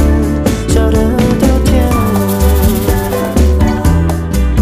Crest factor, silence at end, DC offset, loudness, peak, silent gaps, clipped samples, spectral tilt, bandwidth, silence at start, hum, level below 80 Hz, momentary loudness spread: 10 dB; 0 s; under 0.1%; -12 LUFS; 0 dBFS; none; under 0.1%; -6.5 dB/octave; 15.5 kHz; 0 s; none; -14 dBFS; 4 LU